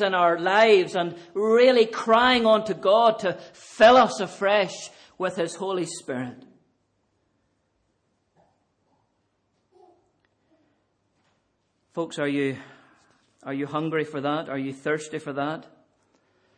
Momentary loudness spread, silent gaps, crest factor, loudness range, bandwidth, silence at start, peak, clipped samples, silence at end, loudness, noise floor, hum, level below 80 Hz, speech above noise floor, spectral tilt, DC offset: 16 LU; none; 20 dB; 15 LU; 10 kHz; 0 s; -6 dBFS; under 0.1%; 0.95 s; -22 LUFS; -72 dBFS; none; -66 dBFS; 50 dB; -4.5 dB/octave; under 0.1%